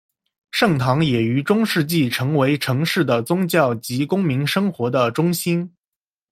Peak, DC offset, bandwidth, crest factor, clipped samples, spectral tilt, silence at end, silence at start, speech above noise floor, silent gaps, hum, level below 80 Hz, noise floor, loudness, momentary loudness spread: -2 dBFS; under 0.1%; 16.5 kHz; 18 dB; under 0.1%; -5.5 dB/octave; 0.65 s; 0.55 s; 70 dB; none; none; -56 dBFS; -89 dBFS; -19 LUFS; 4 LU